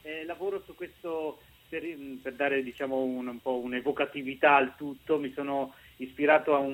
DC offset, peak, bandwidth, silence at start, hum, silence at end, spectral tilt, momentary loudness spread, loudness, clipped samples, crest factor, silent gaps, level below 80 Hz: under 0.1%; -8 dBFS; 16.5 kHz; 0.05 s; none; 0 s; -6 dB/octave; 17 LU; -30 LUFS; under 0.1%; 22 dB; none; -66 dBFS